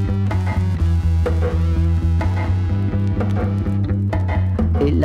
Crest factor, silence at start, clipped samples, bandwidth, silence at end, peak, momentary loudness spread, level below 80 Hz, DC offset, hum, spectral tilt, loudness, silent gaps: 10 dB; 0 s; under 0.1%; 6.2 kHz; 0 s; -8 dBFS; 2 LU; -24 dBFS; under 0.1%; none; -9 dB/octave; -19 LUFS; none